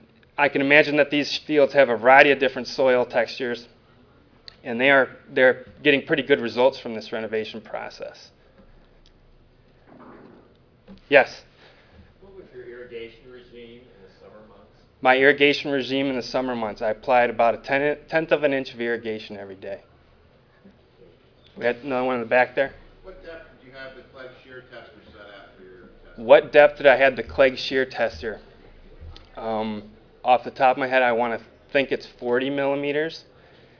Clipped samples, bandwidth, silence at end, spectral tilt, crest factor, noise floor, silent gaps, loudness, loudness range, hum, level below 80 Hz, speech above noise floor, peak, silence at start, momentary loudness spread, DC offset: under 0.1%; 5.4 kHz; 0.6 s; -5 dB/octave; 24 dB; -56 dBFS; none; -21 LUFS; 12 LU; none; -54 dBFS; 35 dB; 0 dBFS; 0.4 s; 23 LU; under 0.1%